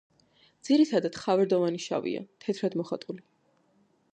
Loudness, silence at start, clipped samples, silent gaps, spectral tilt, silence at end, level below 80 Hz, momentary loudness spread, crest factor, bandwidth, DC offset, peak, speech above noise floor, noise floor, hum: -28 LUFS; 0.65 s; under 0.1%; none; -6 dB/octave; 0.95 s; -76 dBFS; 14 LU; 18 dB; 9.4 kHz; under 0.1%; -12 dBFS; 40 dB; -68 dBFS; none